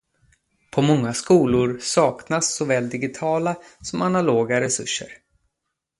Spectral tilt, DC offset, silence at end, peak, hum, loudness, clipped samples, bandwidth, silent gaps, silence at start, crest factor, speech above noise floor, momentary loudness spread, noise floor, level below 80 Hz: -4.5 dB/octave; under 0.1%; 0.85 s; -4 dBFS; none; -21 LUFS; under 0.1%; 11.5 kHz; none; 0.75 s; 18 dB; 59 dB; 9 LU; -80 dBFS; -54 dBFS